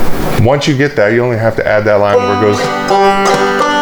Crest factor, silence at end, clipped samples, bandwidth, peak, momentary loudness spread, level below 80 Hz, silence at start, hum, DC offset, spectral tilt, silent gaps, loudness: 10 dB; 0 s; under 0.1%; over 20 kHz; 0 dBFS; 3 LU; -30 dBFS; 0 s; none; under 0.1%; -5.5 dB/octave; none; -11 LUFS